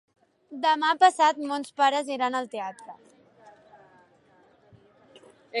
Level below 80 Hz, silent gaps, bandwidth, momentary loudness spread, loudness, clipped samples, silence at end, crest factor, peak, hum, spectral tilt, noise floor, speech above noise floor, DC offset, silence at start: -82 dBFS; none; 11.5 kHz; 20 LU; -25 LUFS; under 0.1%; 0 s; 22 dB; -6 dBFS; none; -2 dB/octave; -60 dBFS; 36 dB; under 0.1%; 0.5 s